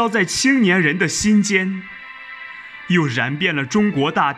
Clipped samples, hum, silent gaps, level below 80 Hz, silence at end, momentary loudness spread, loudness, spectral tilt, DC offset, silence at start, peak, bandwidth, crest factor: under 0.1%; none; none; -52 dBFS; 0 s; 18 LU; -17 LUFS; -4.5 dB/octave; under 0.1%; 0 s; -2 dBFS; 13 kHz; 16 dB